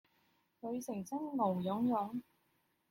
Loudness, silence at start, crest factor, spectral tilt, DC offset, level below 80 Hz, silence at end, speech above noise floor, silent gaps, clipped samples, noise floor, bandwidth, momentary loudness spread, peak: -38 LUFS; 0.65 s; 16 dB; -7.5 dB/octave; under 0.1%; -80 dBFS; 0.7 s; 41 dB; none; under 0.1%; -78 dBFS; 16.5 kHz; 10 LU; -22 dBFS